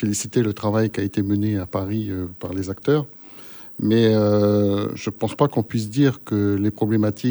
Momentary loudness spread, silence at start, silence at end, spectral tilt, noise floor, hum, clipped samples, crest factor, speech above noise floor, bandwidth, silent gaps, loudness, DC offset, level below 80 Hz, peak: 11 LU; 0 s; 0 s; -6.5 dB/octave; -40 dBFS; none; under 0.1%; 16 dB; 20 dB; over 20 kHz; none; -21 LUFS; under 0.1%; -56 dBFS; -4 dBFS